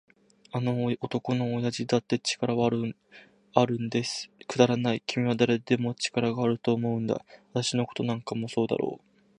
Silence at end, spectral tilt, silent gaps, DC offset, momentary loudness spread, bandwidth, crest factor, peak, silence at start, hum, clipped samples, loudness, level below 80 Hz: 0.4 s; -5.5 dB/octave; none; under 0.1%; 8 LU; 10.5 kHz; 24 dB; -4 dBFS; 0.55 s; none; under 0.1%; -28 LUFS; -66 dBFS